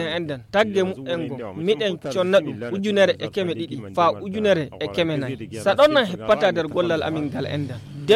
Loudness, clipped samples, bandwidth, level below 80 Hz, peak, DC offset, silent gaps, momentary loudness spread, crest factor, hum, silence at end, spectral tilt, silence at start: -22 LUFS; under 0.1%; 13.5 kHz; -56 dBFS; -4 dBFS; under 0.1%; none; 9 LU; 16 dB; none; 0 s; -5.5 dB/octave; 0 s